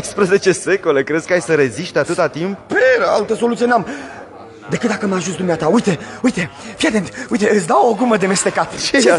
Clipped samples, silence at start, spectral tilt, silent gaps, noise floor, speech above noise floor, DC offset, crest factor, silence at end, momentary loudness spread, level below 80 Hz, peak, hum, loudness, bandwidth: under 0.1%; 0 s; -4.5 dB/octave; none; -35 dBFS; 20 dB; under 0.1%; 14 dB; 0 s; 10 LU; -52 dBFS; 0 dBFS; none; -16 LUFS; 11.5 kHz